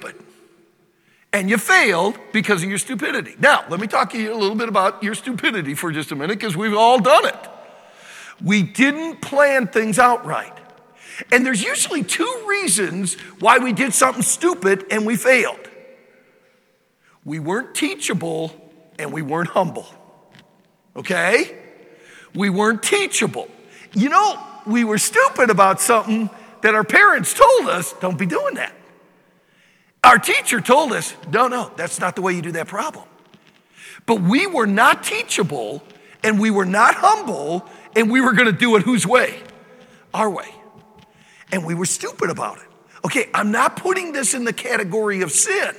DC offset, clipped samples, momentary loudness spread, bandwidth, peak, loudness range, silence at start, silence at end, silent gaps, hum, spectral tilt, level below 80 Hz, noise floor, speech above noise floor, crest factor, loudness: under 0.1%; under 0.1%; 14 LU; 18 kHz; 0 dBFS; 8 LU; 0 s; 0 s; none; none; -3.5 dB/octave; -64 dBFS; -61 dBFS; 43 dB; 20 dB; -17 LUFS